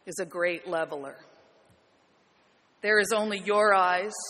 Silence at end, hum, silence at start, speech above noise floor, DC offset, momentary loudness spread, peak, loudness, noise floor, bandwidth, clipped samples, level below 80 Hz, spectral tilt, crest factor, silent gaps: 0 s; none; 0.05 s; 38 dB; under 0.1%; 13 LU; -8 dBFS; -26 LUFS; -65 dBFS; 13 kHz; under 0.1%; -76 dBFS; -3 dB/octave; 20 dB; none